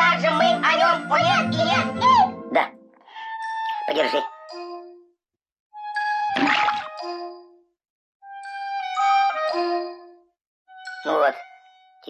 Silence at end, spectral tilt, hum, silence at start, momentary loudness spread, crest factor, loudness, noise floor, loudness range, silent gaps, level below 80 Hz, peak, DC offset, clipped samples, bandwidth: 0 s; -4.5 dB/octave; none; 0 s; 20 LU; 16 dB; -21 LUFS; -74 dBFS; 7 LU; 5.60-5.70 s, 7.90-8.20 s, 10.47-10.65 s; -62 dBFS; -6 dBFS; under 0.1%; under 0.1%; 11 kHz